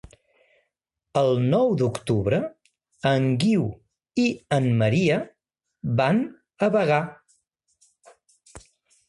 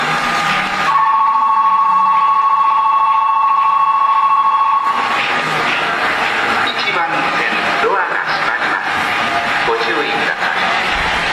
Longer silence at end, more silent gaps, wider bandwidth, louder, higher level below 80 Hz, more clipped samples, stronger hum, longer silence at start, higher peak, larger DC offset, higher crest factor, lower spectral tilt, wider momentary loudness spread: first, 0.5 s vs 0 s; neither; second, 11.5 kHz vs 13.5 kHz; second, -23 LUFS vs -13 LUFS; second, -56 dBFS vs -44 dBFS; neither; neither; first, 1.15 s vs 0 s; about the same, -6 dBFS vs -4 dBFS; neither; first, 18 dB vs 10 dB; first, -7 dB/octave vs -3 dB/octave; first, 11 LU vs 3 LU